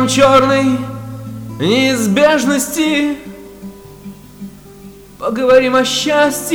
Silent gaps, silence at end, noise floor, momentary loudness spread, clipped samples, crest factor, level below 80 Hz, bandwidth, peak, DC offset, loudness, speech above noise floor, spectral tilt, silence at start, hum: none; 0 s; -37 dBFS; 23 LU; under 0.1%; 14 dB; -46 dBFS; over 20 kHz; 0 dBFS; under 0.1%; -13 LUFS; 24 dB; -4 dB/octave; 0 s; none